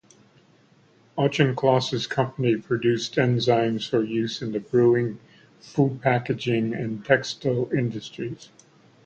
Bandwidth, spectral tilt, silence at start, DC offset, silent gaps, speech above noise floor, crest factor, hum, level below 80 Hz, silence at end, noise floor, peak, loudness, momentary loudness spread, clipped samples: 8.6 kHz; -6.5 dB/octave; 1.15 s; under 0.1%; none; 34 dB; 20 dB; none; -60 dBFS; 0.6 s; -58 dBFS; -4 dBFS; -24 LUFS; 11 LU; under 0.1%